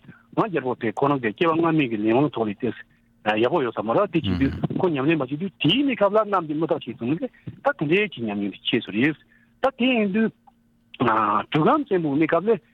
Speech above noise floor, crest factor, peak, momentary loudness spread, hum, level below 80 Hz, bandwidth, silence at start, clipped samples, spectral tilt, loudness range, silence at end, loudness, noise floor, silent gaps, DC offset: 36 dB; 16 dB; -6 dBFS; 7 LU; none; -54 dBFS; 6.8 kHz; 0.1 s; under 0.1%; -8 dB/octave; 2 LU; 0.15 s; -23 LUFS; -58 dBFS; none; under 0.1%